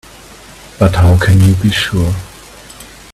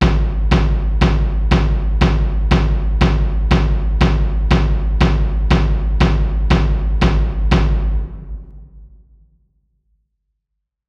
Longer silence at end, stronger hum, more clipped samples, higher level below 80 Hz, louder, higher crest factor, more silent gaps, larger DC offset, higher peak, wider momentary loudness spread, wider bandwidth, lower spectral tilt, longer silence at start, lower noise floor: second, 0.3 s vs 2 s; neither; neither; second, -30 dBFS vs -16 dBFS; first, -11 LUFS vs -17 LUFS; about the same, 12 dB vs 14 dB; neither; second, under 0.1% vs 0.3%; about the same, 0 dBFS vs 0 dBFS; first, 24 LU vs 3 LU; first, 14 kHz vs 7 kHz; second, -6 dB/octave vs -7.5 dB/octave; first, 0.8 s vs 0 s; second, -36 dBFS vs -77 dBFS